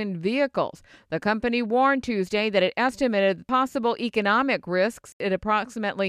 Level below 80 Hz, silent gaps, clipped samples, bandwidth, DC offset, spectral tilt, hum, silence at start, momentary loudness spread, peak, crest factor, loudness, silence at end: -56 dBFS; 5.13-5.20 s; under 0.1%; 13.5 kHz; under 0.1%; -5.5 dB/octave; none; 0 s; 7 LU; -8 dBFS; 16 dB; -24 LUFS; 0 s